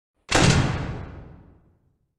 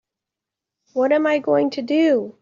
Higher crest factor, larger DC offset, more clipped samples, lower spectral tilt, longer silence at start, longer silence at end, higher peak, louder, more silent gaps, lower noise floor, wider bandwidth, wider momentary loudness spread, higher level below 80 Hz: first, 22 dB vs 14 dB; neither; neither; second, -4.5 dB/octave vs -6 dB/octave; second, 0.3 s vs 0.95 s; first, 0.85 s vs 0.1 s; first, -2 dBFS vs -6 dBFS; about the same, -21 LUFS vs -19 LUFS; neither; second, -65 dBFS vs -86 dBFS; first, 13.5 kHz vs 7.4 kHz; first, 19 LU vs 4 LU; first, -36 dBFS vs -70 dBFS